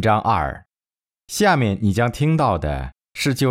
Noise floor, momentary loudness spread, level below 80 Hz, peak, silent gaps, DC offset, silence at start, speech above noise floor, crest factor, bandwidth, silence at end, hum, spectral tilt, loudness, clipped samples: under -90 dBFS; 12 LU; -38 dBFS; -4 dBFS; none; under 0.1%; 0 s; over 72 dB; 16 dB; 16 kHz; 0 s; none; -5.5 dB/octave; -20 LUFS; under 0.1%